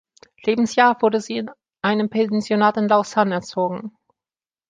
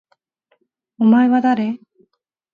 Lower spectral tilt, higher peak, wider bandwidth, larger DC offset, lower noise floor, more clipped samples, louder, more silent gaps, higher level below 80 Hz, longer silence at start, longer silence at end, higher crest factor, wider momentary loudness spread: second, -5.5 dB/octave vs -8.5 dB/octave; about the same, -2 dBFS vs -4 dBFS; first, 9.4 kHz vs 5 kHz; neither; first, under -90 dBFS vs -66 dBFS; neither; second, -20 LUFS vs -16 LUFS; neither; first, -66 dBFS vs -72 dBFS; second, 0.45 s vs 1 s; about the same, 0.8 s vs 0.8 s; about the same, 18 dB vs 16 dB; about the same, 12 LU vs 12 LU